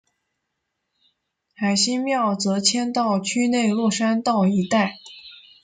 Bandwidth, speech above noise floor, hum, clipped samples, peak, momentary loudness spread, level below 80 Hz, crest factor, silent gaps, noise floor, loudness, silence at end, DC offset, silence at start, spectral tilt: 9.6 kHz; 57 dB; none; under 0.1%; -2 dBFS; 7 LU; -66 dBFS; 20 dB; none; -78 dBFS; -21 LUFS; 0.3 s; under 0.1%; 1.6 s; -4 dB/octave